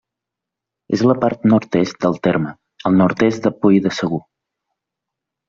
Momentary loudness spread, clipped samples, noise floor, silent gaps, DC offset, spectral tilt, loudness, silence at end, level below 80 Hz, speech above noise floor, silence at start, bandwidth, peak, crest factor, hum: 9 LU; under 0.1%; -84 dBFS; none; under 0.1%; -7 dB/octave; -17 LUFS; 1.3 s; -56 dBFS; 68 dB; 0.9 s; 7.4 kHz; -2 dBFS; 16 dB; none